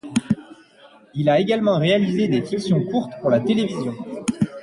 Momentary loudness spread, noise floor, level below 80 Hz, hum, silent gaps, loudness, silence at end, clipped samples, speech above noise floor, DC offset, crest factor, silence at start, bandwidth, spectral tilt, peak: 9 LU; -50 dBFS; -58 dBFS; none; none; -21 LUFS; 0 s; under 0.1%; 30 dB; under 0.1%; 14 dB; 0.05 s; 11.5 kHz; -6.5 dB/octave; -6 dBFS